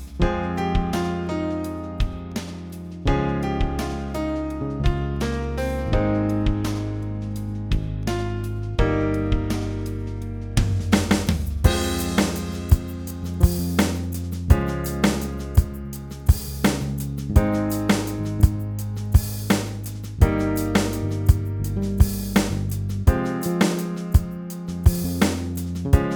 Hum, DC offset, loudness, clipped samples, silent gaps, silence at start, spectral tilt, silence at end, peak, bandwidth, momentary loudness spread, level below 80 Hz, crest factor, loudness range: none; under 0.1%; -24 LUFS; under 0.1%; none; 0 s; -6 dB/octave; 0 s; -2 dBFS; over 20 kHz; 8 LU; -28 dBFS; 20 dB; 4 LU